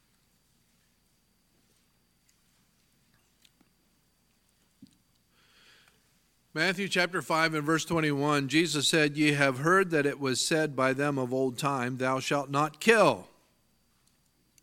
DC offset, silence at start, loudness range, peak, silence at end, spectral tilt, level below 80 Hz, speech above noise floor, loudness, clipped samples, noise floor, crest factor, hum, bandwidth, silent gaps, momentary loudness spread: under 0.1%; 4.8 s; 7 LU; -6 dBFS; 1.4 s; -4 dB/octave; -70 dBFS; 43 dB; -27 LUFS; under 0.1%; -70 dBFS; 24 dB; none; 16.5 kHz; none; 6 LU